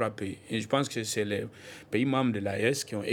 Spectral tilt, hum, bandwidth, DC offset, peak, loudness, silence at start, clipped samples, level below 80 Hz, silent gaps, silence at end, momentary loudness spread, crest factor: -4.5 dB/octave; none; 17.5 kHz; under 0.1%; -12 dBFS; -30 LUFS; 0 s; under 0.1%; -70 dBFS; none; 0 s; 8 LU; 20 dB